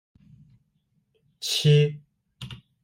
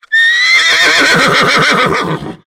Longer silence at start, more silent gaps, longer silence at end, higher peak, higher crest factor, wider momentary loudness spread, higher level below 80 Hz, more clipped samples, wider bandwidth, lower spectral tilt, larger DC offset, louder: first, 1.4 s vs 0.1 s; neither; first, 0.3 s vs 0.15 s; second, -10 dBFS vs 0 dBFS; first, 18 dB vs 10 dB; first, 24 LU vs 6 LU; second, -62 dBFS vs -44 dBFS; neither; second, 16 kHz vs 19 kHz; first, -5.5 dB/octave vs -2.5 dB/octave; neither; second, -22 LUFS vs -7 LUFS